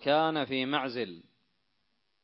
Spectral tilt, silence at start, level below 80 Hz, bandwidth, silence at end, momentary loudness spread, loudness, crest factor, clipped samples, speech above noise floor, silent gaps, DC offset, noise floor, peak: -8.5 dB/octave; 0 s; -80 dBFS; 5.8 kHz; 1 s; 11 LU; -31 LUFS; 20 dB; under 0.1%; 49 dB; none; under 0.1%; -79 dBFS; -12 dBFS